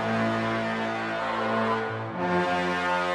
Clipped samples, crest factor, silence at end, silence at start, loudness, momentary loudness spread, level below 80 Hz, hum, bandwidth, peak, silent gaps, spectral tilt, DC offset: under 0.1%; 14 dB; 0 s; 0 s; -27 LUFS; 4 LU; -60 dBFS; none; 12 kHz; -12 dBFS; none; -6 dB/octave; under 0.1%